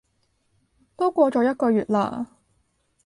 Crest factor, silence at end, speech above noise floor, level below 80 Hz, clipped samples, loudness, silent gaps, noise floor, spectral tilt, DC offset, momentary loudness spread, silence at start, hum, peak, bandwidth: 18 dB; 0.8 s; 48 dB; -64 dBFS; under 0.1%; -22 LUFS; none; -69 dBFS; -7.5 dB/octave; under 0.1%; 11 LU; 1 s; none; -6 dBFS; 11.5 kHz